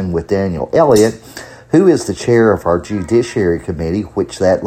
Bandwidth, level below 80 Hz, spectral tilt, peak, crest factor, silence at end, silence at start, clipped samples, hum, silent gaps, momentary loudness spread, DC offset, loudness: 15 kHz; -38 dBFS; -6.5 dB/octave; 0 dBFS; 14 dB; 0 s; 0 s; under 0.1%; none; none; 8 LU; under 0.1%; -14 LUFS